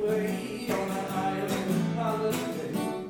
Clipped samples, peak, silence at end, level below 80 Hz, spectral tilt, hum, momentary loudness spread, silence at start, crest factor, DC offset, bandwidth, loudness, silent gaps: under 0.1%; -16 dBFS; 0 s; -60 dBFS; -6 dB/octave; none; 4 LU; 0 s; 14 dB; under 0.1%; 18 kHz; -30 LUFS; none